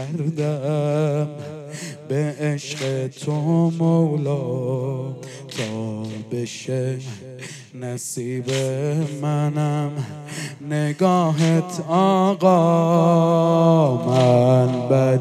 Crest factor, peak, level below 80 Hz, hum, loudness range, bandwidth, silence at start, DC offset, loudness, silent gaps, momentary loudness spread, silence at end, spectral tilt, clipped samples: 16 dB; -4 dBFS; -72 dBFS; none; 11 LU; 13 kHz; 0 s; under 0.1%; -20 LUFS; none; 15 LU; 0 s; -7 dB/octave; under 0.1%